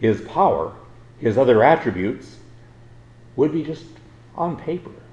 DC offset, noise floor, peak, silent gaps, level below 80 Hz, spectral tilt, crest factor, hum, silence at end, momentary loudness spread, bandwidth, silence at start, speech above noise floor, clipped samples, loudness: under 0.1%; -45 dBFS; 0 dBFS; none; -52 dBFS; -8 dB/octave; 20 dB; none; 0.1 s; 18 LU; 8.6 kHz; 0 s; 26 dB; under 0.1%; -20 LUFS